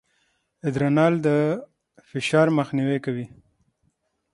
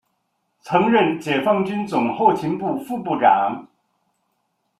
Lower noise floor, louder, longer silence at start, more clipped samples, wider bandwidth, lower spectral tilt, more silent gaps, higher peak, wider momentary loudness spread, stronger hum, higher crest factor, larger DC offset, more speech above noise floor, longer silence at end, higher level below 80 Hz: about the same, -71 dBFS vs -72 dBFS; second, -23 LUFS vs -19 LUFS; about the same, 0.65 s vs 0.65 s; neither; second, 11.5 kHz vs 13.5 kHz; about the same, -7 dB/octave vs -6.5 dB/octave; neither; about the same, -4 dBFS vs -2 dBFS; first, 13 LU vs 9 LU; neither; about the same, 20 dB vs 18 dB; neither; second, 49 dB vs 53 dB; about the same, 1.05 s vs 1.15 s; about the same, -64 dBFS vs -64 dBFS